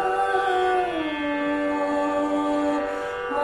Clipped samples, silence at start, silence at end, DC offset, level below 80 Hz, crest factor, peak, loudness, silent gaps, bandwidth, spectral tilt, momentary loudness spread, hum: under 0.1%; 0 s; 0 s; under 0.1%; -54 dBFS; 12 dB; -10 dBFS; -24 LUFS; none; 11 kHz; -4.5 dB/octave; 4 LU; none